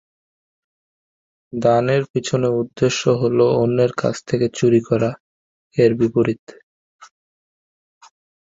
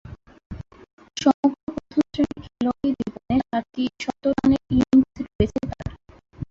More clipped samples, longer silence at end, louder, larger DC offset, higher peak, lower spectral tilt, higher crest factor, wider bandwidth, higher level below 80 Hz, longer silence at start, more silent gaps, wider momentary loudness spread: neither; first, 1.5 s vs 0.05 s; first, -18 LUFS vs -23 LUFS; neither; about the same, -2 dBFS vs -4 dBFS; about the same, -6.5 dB/octave vs -6.5 dB/octave; about the same, 18 dB vs 20 dB; about the same, 7.8 kHz vs 7.6 kHz; second, -56 dBFS vs -42 dBFS; first, 1.55 s vs 0.05 s; first, 2.10-2.14 s, 5.20-5.71 s, 6.39-6.47 s, 6.63-6.99 s vs 0.46-0.50 s, 0.93-0.98 s, 1.34-1.43 s, 1.63-1.67 s, 5.35-5.39 s; second, 6 LU vs 17 LU